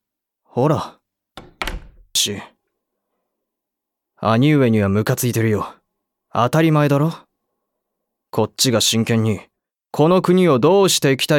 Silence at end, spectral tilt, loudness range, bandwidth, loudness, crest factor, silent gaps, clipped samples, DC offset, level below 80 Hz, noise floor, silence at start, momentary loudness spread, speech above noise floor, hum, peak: 0 s; -5 dB/octave; 7 LU; 18 kHz; -17 LUFS; 16 dB; none; under 0.1%; under 0.1%; -46 dBFS; -82 dBFS; 0.55 s; 14 LU; 66 dB; none; -2 dBFS